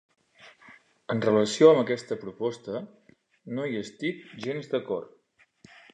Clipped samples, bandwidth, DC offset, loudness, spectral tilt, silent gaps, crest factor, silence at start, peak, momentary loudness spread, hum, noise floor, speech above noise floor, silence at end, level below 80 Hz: under 0.1%; 9.8 kHz; under 0.1%; -27 LUFS; -5.5 dB/octave; none; 24 dB; 0.45 s; -4 dBFS; 18 LU; none; -59 dBFS; 33 dB; 0.9 s; -72 dBFS